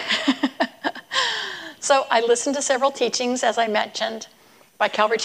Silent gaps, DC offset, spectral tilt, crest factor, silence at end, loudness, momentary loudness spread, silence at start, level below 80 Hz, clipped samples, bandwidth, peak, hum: none; under 0.1%; -1.5 dB/octave; 18 dB; 0 s; -22 LUFS; 9 LU; 0 s; -74 dBFS; under 0.1%; 15.5 kHz; -4 dBFS; none